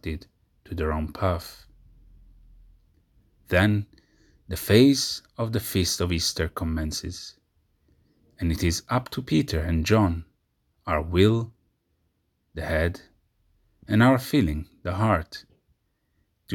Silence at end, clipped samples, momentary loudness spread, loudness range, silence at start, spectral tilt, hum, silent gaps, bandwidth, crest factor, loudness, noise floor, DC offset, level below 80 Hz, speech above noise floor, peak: 0 s; under 0.1%; 19 LU; 5 LU; 0.05 s; -5.5 dB/octave; none; none; 19.5 kHz; 22 dB; -25 LUFS; -72 dBFS; under 0.1%; -44 dBFS; 48 dB; -4 dBFS